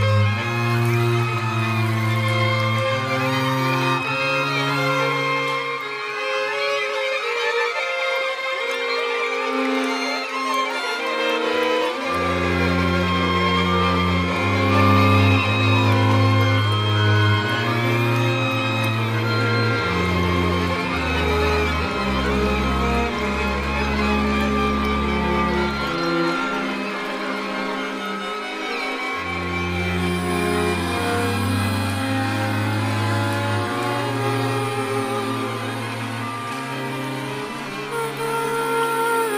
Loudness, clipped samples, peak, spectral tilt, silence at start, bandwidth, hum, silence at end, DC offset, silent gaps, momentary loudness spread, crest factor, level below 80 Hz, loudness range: -21 LUFS; under 0.1%; -4 dBFS; -5.5 dB/octave; 0 s; 15.5 kHz; none; 0 s; under 0.1%; none; 7 LU; 16 dB; -38 dBFS; 7 LU